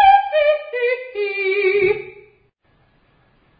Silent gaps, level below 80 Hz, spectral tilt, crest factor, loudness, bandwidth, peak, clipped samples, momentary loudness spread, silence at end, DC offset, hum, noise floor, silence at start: none; -54 dBFS; -8.5 dB/octave; 16 dB; -18 LUFS; 5 kHz; -2 dBFS; under 0.1%; 9 LU; 1.5 s; under 0.1%; none; -59 dBFS; 0 s